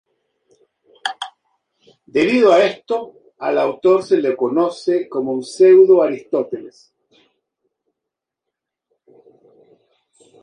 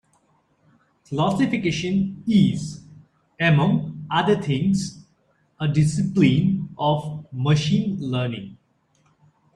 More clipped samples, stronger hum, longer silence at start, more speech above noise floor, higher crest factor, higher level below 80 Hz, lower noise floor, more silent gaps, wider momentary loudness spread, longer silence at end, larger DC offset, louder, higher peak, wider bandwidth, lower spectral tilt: neither; neither; about the same, 1.05 s vs 1.1 s; first, 67 dB vs 44 dB; about the same, 18 dB vs 18 dB; second, -68 dBFS vs -54 dBFS; first, -83 dBFS vs -64 dBFS; neither; first, 17 LU vs 12 LU; first, 3.75 s vs 1 s; neither; first, -16 LUFS vs -22 LUFS; about the same, -2 dBFS vs -4 dBFS; about the same, 10 kHz vs 11 kHz; about the same, -5.5 dB/octave vs -6.5 dB/octave